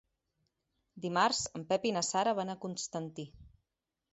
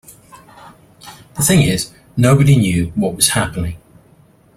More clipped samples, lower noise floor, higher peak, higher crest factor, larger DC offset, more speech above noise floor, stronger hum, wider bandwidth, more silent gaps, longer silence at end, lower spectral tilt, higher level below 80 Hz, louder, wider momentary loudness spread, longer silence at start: neither; first, -88 dBFS vs -49 dBFS; second, -14 dBFS vs 0 dBFS; first, 22 dB vs 16 dB; neither; first, 55 dB vs 36 dB; neither; second, 8 kHz vs 16.5 kHz; neither; second, 0.65 s vs 0.8 s; second, -3 dB/octave vs -5 dB/octave; second, -68 dBFS vs -38 dBFS; second, -33 LUFS vs -15 LUFS; about the same, 14 LU vs 14 LU; first, 0.95 s vs 0.65 s